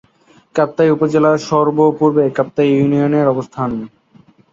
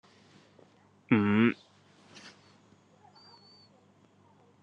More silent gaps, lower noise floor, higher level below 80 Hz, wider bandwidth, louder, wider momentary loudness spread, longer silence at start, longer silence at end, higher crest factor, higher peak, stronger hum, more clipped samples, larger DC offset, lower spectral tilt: neither; second, -51 dBFS vs -63 dBFS; first, -54 dBFS vs -80 dBFS; about the same, 7.6 kHz vs 7.4 kHz; first, -15 LUFS vs -27 LUFS; second, 9 LU vs 26 LU; second, 0.55 s vs 1.1 s; second, 0.65 s vs 2.35 s; second, 14 dB vs 24 dB; first, -2 dBFS vs -12 dBFS; neither; neither; neither; about the same, -7.5 dB/octave vs -7.5 dB/octave